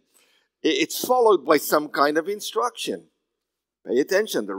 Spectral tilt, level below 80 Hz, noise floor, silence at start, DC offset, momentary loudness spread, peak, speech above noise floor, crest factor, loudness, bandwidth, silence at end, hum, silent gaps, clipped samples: -3 dB/octave; -86 dBFS; -83 dBFS; 0.65 s; under 0.1%; 11 LU; -2 dBFS; 62 dB; 20 dB; -22 LUFS; 16.5 kHz; 0 s; none; none; under 0.1%